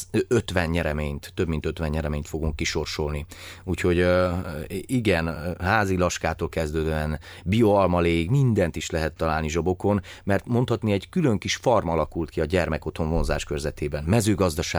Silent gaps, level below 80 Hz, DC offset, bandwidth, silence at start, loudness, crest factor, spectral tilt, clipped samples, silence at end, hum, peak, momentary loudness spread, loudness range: none; -38 dBFS; under 0.1%; over 20 kHz; 0 s; -25 LUFS; 18 dB; -6 dB/octave; under 0.1%; 0 s; none; -6 dBFS; 9 LU; 3 LU